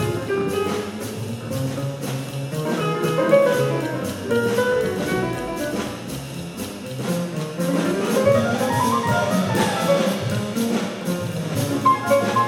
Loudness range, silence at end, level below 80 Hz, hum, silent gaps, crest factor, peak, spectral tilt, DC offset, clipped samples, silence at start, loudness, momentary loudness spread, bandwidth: 5 LU; 0 s; -52 dBFS; none; none; 16 dB; -4 dBFS; -5.5 dB/octave; under 0.1%; under 0.1%; 0 s; -22 LUFS; 11 LU; 18 kHz